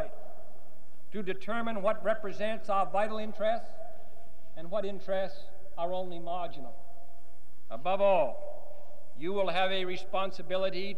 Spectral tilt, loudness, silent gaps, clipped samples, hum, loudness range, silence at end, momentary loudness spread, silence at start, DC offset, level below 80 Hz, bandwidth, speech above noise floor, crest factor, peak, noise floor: -6 dB/octave; -33 LUFS; none; under 0.1%; none; 6 LU; 0 s; 21 LU; 0 s; 5%; -66 dBFS; 15 kHz; 29 dB; 18 dB; -14 dBFS; -62 dBFS